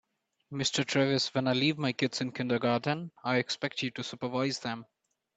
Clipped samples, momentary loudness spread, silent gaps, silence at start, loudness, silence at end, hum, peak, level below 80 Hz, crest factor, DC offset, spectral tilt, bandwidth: under 0.1%; 8 LU; none; 0.5 s; -30 LUFS; 0.55 s; none; -12 dBFS; -72 dBFS; 20 dB; under 0.1%; -4.5 dB/octave; 8.6 kHz